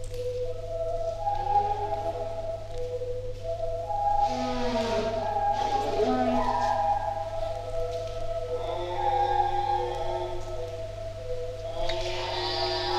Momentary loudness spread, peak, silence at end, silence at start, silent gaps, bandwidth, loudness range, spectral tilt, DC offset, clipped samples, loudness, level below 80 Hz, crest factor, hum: 10 LU; -12 dBFS; 0 s; 0 s; none; 12.5 kHz; 4 LU; -5.5 dB/octave; under 0.1%; under 0.1%; -29 LUFS; -38 dBFS; 16 dB; 50 Hz at -45 dBFS